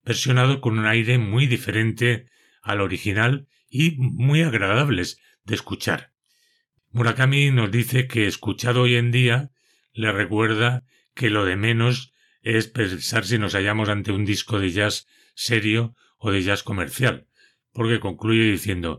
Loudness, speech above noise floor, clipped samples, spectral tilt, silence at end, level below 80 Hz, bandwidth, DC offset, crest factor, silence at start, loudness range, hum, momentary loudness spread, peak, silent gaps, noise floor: -21 LUFS; 46 dB; under 0.1%; -5.5 dB/octave; 0 s; -60 dBFS; 14.5 kHz; under 0.1%; 18 dB; 0.05 s; 3 LU; none; 10 LU; -4 dBFS; none; -67 dBFS